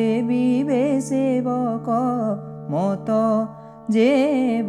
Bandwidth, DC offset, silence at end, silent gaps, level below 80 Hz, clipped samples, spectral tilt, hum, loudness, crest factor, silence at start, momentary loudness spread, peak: 11.5 kHz; under 0.1%; 0 s; none; -66 dBFS; under 0.1%; -7 dB/octave; none; -21 LUFS; 14 dB; 0 s; 8 LU; -6 dBFS